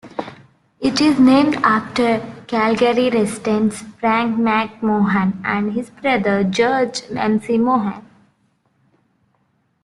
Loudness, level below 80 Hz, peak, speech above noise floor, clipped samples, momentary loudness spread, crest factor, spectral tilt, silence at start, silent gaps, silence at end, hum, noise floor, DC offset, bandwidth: -17 LUFS; -56 dBFS; -2 dBFS; 47 dB; under 0.1%; 9 LU; 16 dB; -5.5 dB/octave; 0.05 s; none; 1.85 s; none; -64 dBFS; under 0.1%; 12 kHz